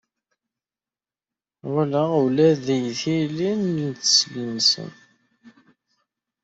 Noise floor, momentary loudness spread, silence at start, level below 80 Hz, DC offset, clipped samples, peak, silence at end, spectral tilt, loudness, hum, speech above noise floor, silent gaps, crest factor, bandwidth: under -90 dBFS; 9 LU; 1.65 s; -66 dBFS; under 0.1%; under 0.1%; -4 dBFS; 0.95 s; -4 dB/octave; -21 LUFS; none; over 69 dB; none; 20 dB; 8 kHz